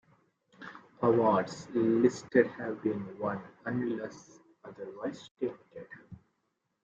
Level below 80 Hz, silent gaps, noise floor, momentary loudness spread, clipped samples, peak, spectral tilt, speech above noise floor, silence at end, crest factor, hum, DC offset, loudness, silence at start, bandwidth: -72 dBFS; 5.31-5.35 s; -80 dBFS; 22 LU; under 0.1%; -10 dBFS; -7 dB/octave; 49 dB; 0.7 s; 22 dB; none; under 0.1%; -31 LUFS; 0.6 s; 8 kHz